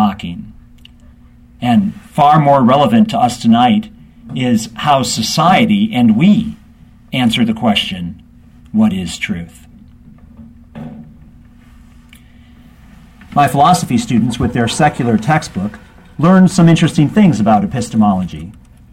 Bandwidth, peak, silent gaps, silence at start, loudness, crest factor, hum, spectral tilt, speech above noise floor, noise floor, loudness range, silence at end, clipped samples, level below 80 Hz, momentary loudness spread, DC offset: 15.5 kHz; 0 dBFS; none; 0 s; -12 LUFS; 14 dB; 60 Hz at -40 dBFS; -6 dB/octave; 30 dB; -42 dBFS; 10 LU; 0.4 s; under 0.1%; -42 dBFS; 16 LU; under 0.1%